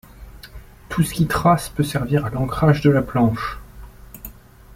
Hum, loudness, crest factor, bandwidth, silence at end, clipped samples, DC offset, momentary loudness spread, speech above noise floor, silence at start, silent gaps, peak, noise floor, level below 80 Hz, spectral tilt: none; -19 LUFS; 18 dB; 16.5 kHz; 0.45 s; under 0.1%; under 0.1%; 21 LU; 23 dB; 0.2 s; none; -2 dBFS; -41 dBFS; -40 dBFS; -6.5 dB/octave